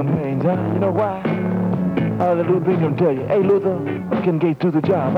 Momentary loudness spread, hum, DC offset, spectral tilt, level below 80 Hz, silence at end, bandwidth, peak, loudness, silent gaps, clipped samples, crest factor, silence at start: 4 LU; none; under 0.1%; -10 dB/octave; -54 dBFS; 0 s; 5.4 kHz; -8 dBFS; -19 LUFS; none; under 0.1%; 12 dB; 0 s